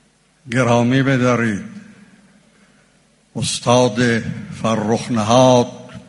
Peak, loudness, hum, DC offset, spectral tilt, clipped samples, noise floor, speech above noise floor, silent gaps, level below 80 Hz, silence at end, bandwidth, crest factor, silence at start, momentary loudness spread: 0 dBFS; -16 LUFS; none; under 0.1%; -5.5 dB/octave; under 0.1%; -55 dBFS; 40 dB; none; -52 dBFS; 0.1 s; 11.5 kHz; 18 dB; 0.45 s; 12 LU